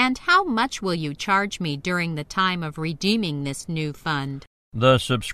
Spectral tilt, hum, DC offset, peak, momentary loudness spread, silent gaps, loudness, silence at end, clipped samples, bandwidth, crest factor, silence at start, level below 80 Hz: -5 dB/octave; none; under 0.1%; -4 dBFS; 10 LU; 4.47-4.72 s; -23 LUFS; 0 s; under 0.1%; 14 kHz; 20 dB; 0 s; -52 dBFS